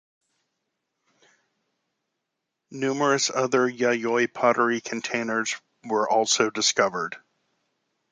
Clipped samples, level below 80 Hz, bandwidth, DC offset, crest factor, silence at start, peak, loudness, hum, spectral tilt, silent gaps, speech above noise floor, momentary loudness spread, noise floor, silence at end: under 0.1%; -74 dBFS; 10 kHz; under 0.1%; 22 dB; 2.7 s; -6 dBFS; -24 LUFS; none; -2.5 dB/octave; none; 58 dB; 10 LU; -82 dBFS; 0.95 s